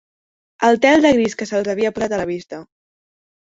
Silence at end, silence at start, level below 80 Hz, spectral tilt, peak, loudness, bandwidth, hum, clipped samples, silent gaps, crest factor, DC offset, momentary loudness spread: 0.9 s; 0.6 s; -54 dBFS; -4.5 dB/octave; -2 dBFS; -17 LUFS; 8 kHz; none; under 0.1%; none; 18 dB; under 0.1%; 16 LU